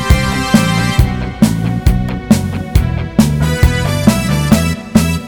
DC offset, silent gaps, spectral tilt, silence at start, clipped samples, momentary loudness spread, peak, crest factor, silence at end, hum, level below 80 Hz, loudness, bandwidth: under 0.1%; none; -5.5 dB/octave; 0 s; 0.6%; 3 LU; 0 dBFS; 12 dB; 0 s; none; -20 dBFS; -13 LUFS; over 20 kHz